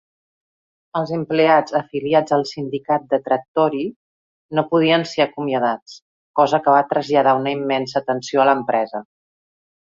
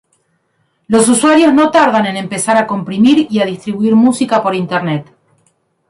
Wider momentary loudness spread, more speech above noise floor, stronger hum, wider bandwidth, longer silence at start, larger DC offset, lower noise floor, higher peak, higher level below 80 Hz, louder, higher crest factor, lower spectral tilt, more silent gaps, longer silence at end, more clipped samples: about the same, 10 LU vs 9 LU; first, over 72 dB vs 51 dB; neither; second, 7.6 kHz vs 11.5 kHz; about the same, 0.95 s vs 0.9 s; neither; first, under -90 dBFS vs -62 dBFS; about the same, -2 dBFS vs 0 dBFS; second, -64 dBFS vs -54 dBFS; second, -19 LUFS vs -12 LUFS; first, 18 dB vs 12 dB; first, -6 dB/octave vs -4.5 dB/octave; first, 3.48-3.55 s, 3.96-4.49 s, 5.82-5.86 s, 6.02-6.34 s vs none; about the same, 0.9 s vs 0.85 s; neither